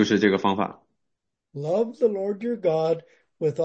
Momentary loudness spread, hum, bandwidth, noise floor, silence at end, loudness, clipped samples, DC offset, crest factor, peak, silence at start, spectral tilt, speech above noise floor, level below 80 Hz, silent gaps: 10 LU; none; 8 kHz; -81 dBFS; 0 s; -25 LUFS; under 0.1%; under 0.1%; 18 dB; -6 dBFS; 0 s; -6 dB/octave; 58 dB; -70 dBFS; none